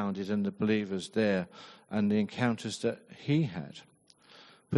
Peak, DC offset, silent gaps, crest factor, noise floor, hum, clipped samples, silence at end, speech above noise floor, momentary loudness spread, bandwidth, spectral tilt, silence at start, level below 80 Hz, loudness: -12 dBFS; under 0.1%; none; 20 dB; -60 dBFS; none; under 0.1%; 0 s; 29 dB; 13 LU; 11.5 kHz; -6.5 dB/octave; 0 s; -72 dBFS; -31 LUFS